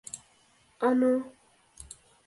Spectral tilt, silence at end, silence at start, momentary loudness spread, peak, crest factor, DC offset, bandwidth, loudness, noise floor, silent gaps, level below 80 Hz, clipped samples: -4.5 dB/octave; 0.45 s; 0.15 s; 22 LU; -14 dBFS; 18 dB; under 0.1%; 11.5 kHz; -27 LUFS; -64 dBFS; none; -64 dBFS; under 0.1%